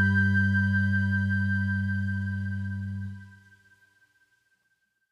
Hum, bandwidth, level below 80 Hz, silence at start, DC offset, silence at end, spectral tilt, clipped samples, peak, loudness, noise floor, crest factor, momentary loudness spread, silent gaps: none; 5 kHz; -64 dBFS; 0 s; under 0.1%; 1.75 s; -8 dB/octave; under 0.1%; -14 dBFS; -27 LUFS; -74 dBFS; 14 dB; 12 LU; none